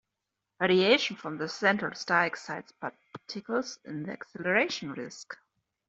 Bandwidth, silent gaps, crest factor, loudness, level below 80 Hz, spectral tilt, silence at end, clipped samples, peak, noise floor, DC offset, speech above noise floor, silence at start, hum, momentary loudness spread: 7.8 kHz; none; 22 dB; -29 LUFS; -74 dBFS; -4 dB/octave; 0.55 s; under 0.1%; -10 dBFS; -86 dBFS; under 0.1%; 56 dB; 0.6 s; none; 17 LU